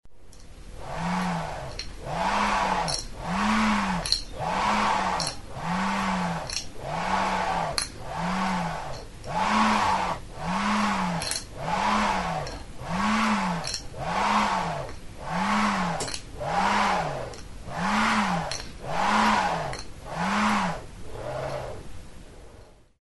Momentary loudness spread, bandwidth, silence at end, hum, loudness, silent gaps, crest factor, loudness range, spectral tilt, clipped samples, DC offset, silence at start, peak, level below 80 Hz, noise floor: 14 LU; 11.5 kHz; 0.35 s; none; -27 LUFS; none; 24 dB; 3 LU; -4 dB/octave; under 0.1%; under 0.1%; 0.05 s; -4 dBFS; -44 dBFS; -50 dBFS